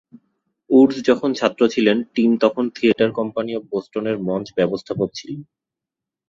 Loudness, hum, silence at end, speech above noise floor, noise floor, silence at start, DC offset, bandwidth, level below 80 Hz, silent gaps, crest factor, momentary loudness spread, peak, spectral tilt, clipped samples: -19 LUFS; none; 0.85 s; 67 dB; -86 dBFS; 0.7 s; under 0.1%; 7.6 kHz; -60 dBFS; none; 18 dB; 11 LU; -2 dBFS; -6 dB/octave; under 0.1%